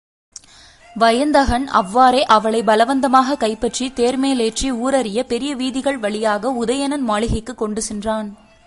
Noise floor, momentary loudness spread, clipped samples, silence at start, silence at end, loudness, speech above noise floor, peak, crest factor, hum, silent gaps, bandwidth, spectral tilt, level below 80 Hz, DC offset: -46 dBFS; 9 LU; under 0.1%; 0.95 s; 0.3 s; -17 LUFS; 29 dB; 0 dBFS; 18 dB; none; none; 11.5 kHz; -4 dB/octave; -38 dBFS; under 0.1%